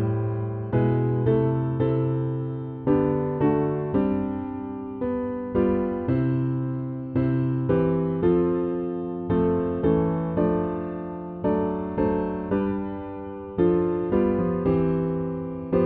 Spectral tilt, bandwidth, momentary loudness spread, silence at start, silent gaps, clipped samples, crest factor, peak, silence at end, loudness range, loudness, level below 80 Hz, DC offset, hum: -12.5 dB/octave; 3.9 kHz; 8 LU; 0 s; none; under 0.1%; 14 dB; -8 dBFS; 0 s; 2 LU; -25 LUFS; -46 dBFS; under 0.1%; none